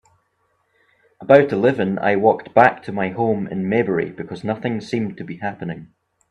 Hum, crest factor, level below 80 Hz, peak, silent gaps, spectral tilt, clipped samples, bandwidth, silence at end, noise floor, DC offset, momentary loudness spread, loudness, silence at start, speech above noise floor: none; 20 dB; -60 dBFS; 0 dBFS; none; -8 dB/octave; under 0.1%; 9 kHz; 0.45 s; -67 dBFS; under 0.1%; 14 LU; -19 LUFS; 1.2 s; 48 dB